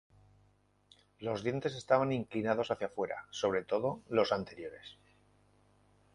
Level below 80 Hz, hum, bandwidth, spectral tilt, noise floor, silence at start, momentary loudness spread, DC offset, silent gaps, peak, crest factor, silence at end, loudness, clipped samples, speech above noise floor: -68 dBFS; 50 Hz at -60 dBFS; 11 kHz; -5.5 dB/octave; -70 dBFS; 1.2 s; 14 LU; under 0.1%; none; -14 dBFS; 22 dB; 1.2 s; -34 LUFS; under 0.1%; 36 dB